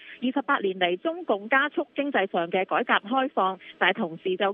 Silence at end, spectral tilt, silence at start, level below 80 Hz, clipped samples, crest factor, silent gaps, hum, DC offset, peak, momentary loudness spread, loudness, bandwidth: 0 s; -1.5 dB/octave; 0 s; -80 dBFS; under 0.1%; 20 dB; none; none; under 0.1%; -6 dBFS; 6 LU; -25 LUFS; 4 kHz